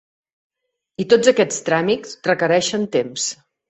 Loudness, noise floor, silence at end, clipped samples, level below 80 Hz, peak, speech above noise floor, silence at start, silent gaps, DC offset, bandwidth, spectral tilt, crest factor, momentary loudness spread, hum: -18 LUFS; -53 dBFS; 0.35 s; under 0.1%; -62 dBFS; -2 dBFS; 35 dB; 1 s; none; under 0.1%; 8.4 kHz; -3.5 dB/octave; 18 dB; 10 LU; none